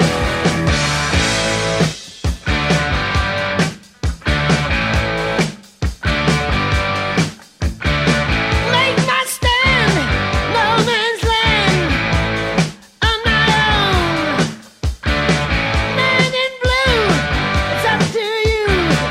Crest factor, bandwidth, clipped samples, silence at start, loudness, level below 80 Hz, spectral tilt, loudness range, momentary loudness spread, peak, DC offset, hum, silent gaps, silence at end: 16 dB; 15.5 kHz; under 0.1%; 0 s; -16 LUFS; -26 dBFS; -4.5 dB/octave; 3 LU; 8 LU; 0 dBFS; under 0.1%; none; none; 0 s